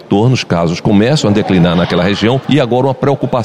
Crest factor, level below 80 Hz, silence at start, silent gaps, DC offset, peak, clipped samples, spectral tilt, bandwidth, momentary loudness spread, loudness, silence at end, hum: 10 dB; -40 dBFS; 0 s; none; under 0.1%; 0 dBFS; under 0.1%; -6.5 dB/octave; 11 kHz; 3 LU; -12 LUFS; 0 s; none